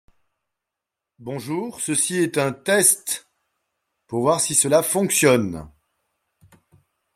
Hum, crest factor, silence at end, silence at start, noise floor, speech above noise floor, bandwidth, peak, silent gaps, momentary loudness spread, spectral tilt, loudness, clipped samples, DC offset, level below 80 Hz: none; 20 dB; 1.45 s; 1.2 s; -85 dBFS; 65 dB; 16.5 kHz; -2 dBFS; none; 14 LU; -3 dB/octave; -19 LUFS; under 0.1%; under 0.1%; -60 dBFS